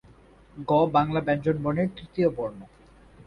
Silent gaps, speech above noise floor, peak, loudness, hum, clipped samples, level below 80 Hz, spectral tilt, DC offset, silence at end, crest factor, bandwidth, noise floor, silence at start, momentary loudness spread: none; 29 dB; -8 dBFS; -25 LUFS; none; under 0.1%; -54 dBFS; -9 dB/octave; under 0.1%; 0.6 s; 18 dB; 10.5 kHz; -53 dBFS; 0.55 s; 12 LU